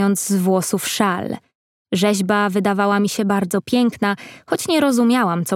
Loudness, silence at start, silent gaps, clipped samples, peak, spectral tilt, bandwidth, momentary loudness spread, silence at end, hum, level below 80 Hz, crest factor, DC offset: -18 LUFS; 0 s; 1.55-1.85 s; under 0.1%; -2 dBFS; -4.5 dB/octave; 17 kHz; 9 LU; 0 s; none; -64 dBFS; 16 dB; under 0.1%